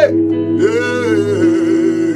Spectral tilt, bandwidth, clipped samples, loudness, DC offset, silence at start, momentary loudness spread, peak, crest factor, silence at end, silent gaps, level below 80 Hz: -6.5 dB/octave; 10 kHz; under 0.1%; -14 LUFS; under 0.1%; 0 s; 2 LU; 0 dBFS; 12 dB; 0 s; none; -60 dBFS